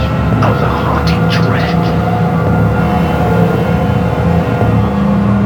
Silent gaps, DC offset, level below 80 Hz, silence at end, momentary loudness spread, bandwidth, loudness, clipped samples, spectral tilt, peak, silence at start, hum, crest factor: none; under 0.1%; -24 dBFS; 0 s; 1 LU; 18 kHz; -12 LUFS; under 0.1%; -8 dB/octave; 0 dBFS; 0 s; none; 10 dB